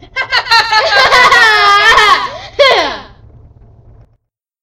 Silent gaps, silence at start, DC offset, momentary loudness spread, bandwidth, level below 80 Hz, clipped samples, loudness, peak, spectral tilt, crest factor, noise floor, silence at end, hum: none; 0.15 s; under 0.1%; 9 LU; over 20 kHz; -40 dBFS; 0.8%; -7 LUFS; 0 dBFS; -1 dB/octave; 10 dB; -59 dBFS; 1.6 s; none